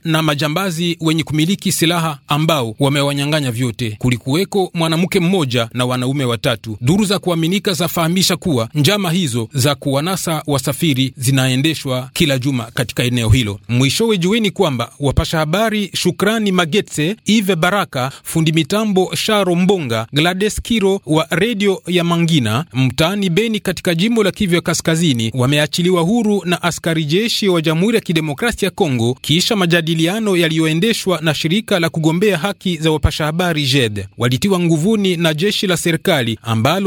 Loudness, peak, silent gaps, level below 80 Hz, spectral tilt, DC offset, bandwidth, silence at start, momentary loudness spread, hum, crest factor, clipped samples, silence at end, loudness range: -16 LUFS; 0 dBFS; none; -38 dBFS; -5 dB/octave; under 0.1%; 19.5 kHz; 0.05 s; 4 LU; none; 14 dB; under 0.1%; 0 s; 1 LU